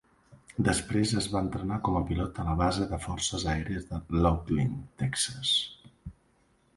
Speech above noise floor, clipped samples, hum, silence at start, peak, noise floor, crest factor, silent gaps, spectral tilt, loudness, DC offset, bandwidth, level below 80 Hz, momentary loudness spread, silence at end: 38 dB; under 0.1%; none; 0.3 s; -10 dBFS; -67 dBFS; 20 dB; none; -4.5 dB/octave; -29 LUFS; under 0.1%; 11.5 kHz; -42 dBFS; 10 LU; 0.65 s